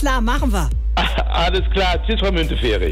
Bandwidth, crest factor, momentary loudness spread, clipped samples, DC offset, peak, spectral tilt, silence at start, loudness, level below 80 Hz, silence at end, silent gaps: 13.5 kHz; 10 dB; 2 LU; under 0.1%; under 0.1%; -6 dBFS; -5.5 dB/octave; 0 s; -19 LUFS; -20 dBFS; 0 s; none